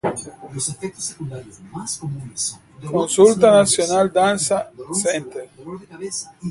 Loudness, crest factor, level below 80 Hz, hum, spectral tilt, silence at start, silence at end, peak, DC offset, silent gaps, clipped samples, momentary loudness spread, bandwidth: -19 LUFS; 20 dB; -56 dBFS; none; -4 dB/octave; 0.05 s; 0 s; 0 dBFS; under 0.1%; none; under 0.1%; 21 LU; 11.5 kHz